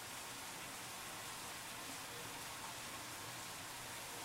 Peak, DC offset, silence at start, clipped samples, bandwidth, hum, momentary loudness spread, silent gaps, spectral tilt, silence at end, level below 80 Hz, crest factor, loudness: -36 dBFS; under 0.1%; 0 s; under 0.1%; 16 kHz; none; 0 LU; none; -1.5 dB/octave; 0 s; -74 dBFS; 14 dB; -47 LUFS